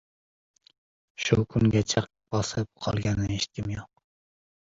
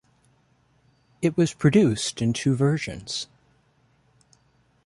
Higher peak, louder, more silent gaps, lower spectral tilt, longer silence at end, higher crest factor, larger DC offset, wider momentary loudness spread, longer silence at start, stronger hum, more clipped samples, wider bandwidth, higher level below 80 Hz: about the same, -6 dBFS vs -6 dBFS; second, -27 LUFS vs -23 LUFS; neither; about the same, -5.5 dB/octave vs -5.5 dB/octave; second, 0.85 s vs 1.6 s; about the same, 22 dB vs 18 dB; neither; about the same, 11 LU vs 12 LU; about the same, 1.2 s vs 1.2 s; neither; neither; second, 7.8 kHz vs 11.5 kHz; first, -46 dBFS vs -56 dBFS